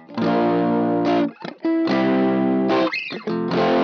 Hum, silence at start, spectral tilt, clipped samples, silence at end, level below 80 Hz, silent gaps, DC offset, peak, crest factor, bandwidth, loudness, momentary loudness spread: none; 0.1 s; -7.5 dB/octave; under 0.1%; 0 s; -66 dBFS; none; under 0.1%; -8 dBFS; 12 dB; 6.6 kHz; -20 LUFS; 7 LU